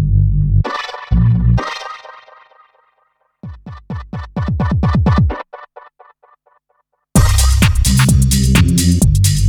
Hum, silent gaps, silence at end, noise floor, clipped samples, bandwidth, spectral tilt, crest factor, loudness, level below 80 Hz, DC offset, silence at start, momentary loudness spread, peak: none; none; 0 s; -64 dBFS; under 0.1%; 20 kHz; -5 dB/octave; 14 dB; -14 LUFS; -20 dBFS; under 0.1%; 0 s; 21 LU; 0 dBFS